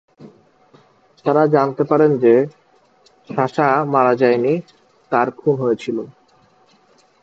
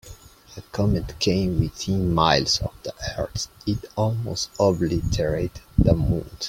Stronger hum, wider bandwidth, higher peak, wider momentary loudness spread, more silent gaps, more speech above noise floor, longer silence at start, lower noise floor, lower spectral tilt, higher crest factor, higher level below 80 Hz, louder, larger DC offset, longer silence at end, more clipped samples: neither; second, 7.6 kHz vs 16.5 kHz; about the same, 0 dBFS vs -2 dBFS; about the same, 11 LU vs 10 LU; neither; first, 39 dB vs 22 dB; first, 0.2 s vs 0.05 s; first, -55 dBFS vs -45 dBFS; first, -8.5 dB/octave vs -5.5 dB/octave; about the same, 18 dB vs 22 dB; second, -66 dBFS vs -36 dBFS; first, -17 LUFS vs -23 LUFS; neither; first, 1.1 s vs 0 s; neither